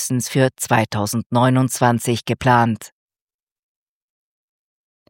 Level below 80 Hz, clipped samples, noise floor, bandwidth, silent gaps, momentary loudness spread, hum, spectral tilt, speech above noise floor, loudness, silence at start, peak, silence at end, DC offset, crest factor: -54 dBFS; under 0.1%; under -90 dBFS; 17 kHz; 1.26-1.30 s; 6 LU; none; -5 dB/octave; over 72 dB; -18 LUFS; 0 s; 0 dBFS; 2.25 s; under 0.1%; 20 dB